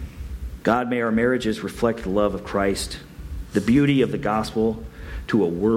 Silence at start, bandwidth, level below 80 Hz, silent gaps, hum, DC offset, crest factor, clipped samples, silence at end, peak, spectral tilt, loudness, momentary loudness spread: 0 s; 16 kHz; -38 dBFS; none; none; under 0.1%; 16 dB; under 0.1%; 0 s; -6 dBFS; -6 dB/octave; -22 LUFS; 16 LU